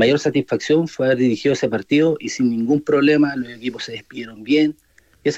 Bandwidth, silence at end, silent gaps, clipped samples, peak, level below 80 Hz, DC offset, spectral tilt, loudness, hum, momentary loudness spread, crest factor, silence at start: 8.2 kHz; 0 s; none; under 0.1%; -6 dBFS; -60 dBFS; under 0.1%; -5.5 dB/octave; -19 LUFS; none; 12 LU; 14 dB; 0 s